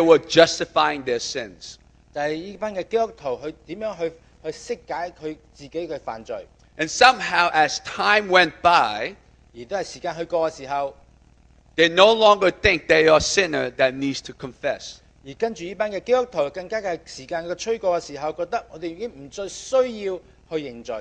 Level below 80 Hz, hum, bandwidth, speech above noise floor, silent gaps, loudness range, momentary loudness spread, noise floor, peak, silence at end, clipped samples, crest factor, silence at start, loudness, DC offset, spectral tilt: -52 dBFS; none; 9.6 kHz; 32 dB; none; 11 LU; 18 LU; -54 dBFS; 0 dBFS; 0 s; under 0.1%; 22 dB; 0 s; -21 LUFS; under 0.1%; -3 dB/octave